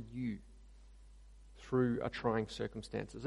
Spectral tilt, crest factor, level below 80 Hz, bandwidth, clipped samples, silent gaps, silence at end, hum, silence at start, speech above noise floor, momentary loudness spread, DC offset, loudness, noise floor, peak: -7 dB/octave; 20 dB; -58 dBFS; 11.5 kHz; under 0.1%; none; 0 s; none; 0 s; 20 dB; 10 LU; under 0.1%; -38 LUFS; -58 dBFS; -20 dBFS